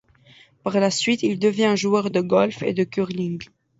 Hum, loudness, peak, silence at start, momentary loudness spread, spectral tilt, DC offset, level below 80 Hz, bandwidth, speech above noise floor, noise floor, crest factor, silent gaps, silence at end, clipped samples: none; -21 LUFS; -4 dBFS; 0.65 s; 9 LU; -5 dB/octave; under 0.1%; -62 dBFS; 8 kHz; 32 dB; -53 dBFS; 18 dB; none; 0.35 s; under 0.1%